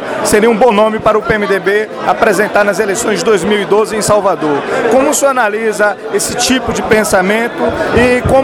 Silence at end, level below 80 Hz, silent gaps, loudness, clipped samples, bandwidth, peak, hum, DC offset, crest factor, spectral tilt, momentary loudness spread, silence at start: 0 s; -36 dBFS; none; -11 LUFS; 0.3%; 19 kHz; 0 dBFS; none; under 0.1%; 10 dB; -4 dB/octave; 5 LU; 0 s